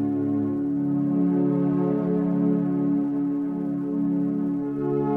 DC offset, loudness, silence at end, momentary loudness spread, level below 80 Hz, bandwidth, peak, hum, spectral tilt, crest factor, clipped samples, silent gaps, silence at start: under 0.1%; -24 LUFS; 0 s; 4 LU; -62 dBFS; 2.9 kHz; -12 dBFS; none; -12 dB/octave; 12 dB; under 0.1%; none; 0 s